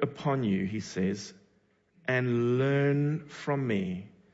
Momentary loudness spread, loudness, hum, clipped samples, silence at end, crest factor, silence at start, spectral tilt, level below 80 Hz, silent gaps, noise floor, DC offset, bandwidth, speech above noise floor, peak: 12 LU; -30 LUFS; none; under 0.1%; 0.25 s; 16 dB; 0 s; -7 dB/octave; -68 dBFS; none; -68 dBFS; under 0.1%; 8 kHz; 40 dB; -14 dBFS